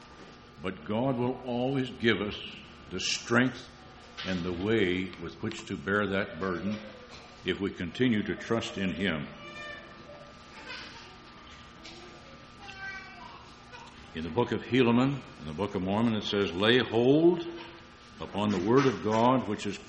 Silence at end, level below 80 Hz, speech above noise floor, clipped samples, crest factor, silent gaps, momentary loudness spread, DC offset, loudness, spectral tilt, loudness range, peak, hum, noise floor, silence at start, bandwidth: 0 s; -58 dBFS; 22 dB; under 0.1%; 22 dB; none; 23 LU; under 0.1%; -29 LUFS; -5.5 dB/octave; 17 LU; -8 dBFS; none; -50 dBFS; 0 s; 8.8 kHz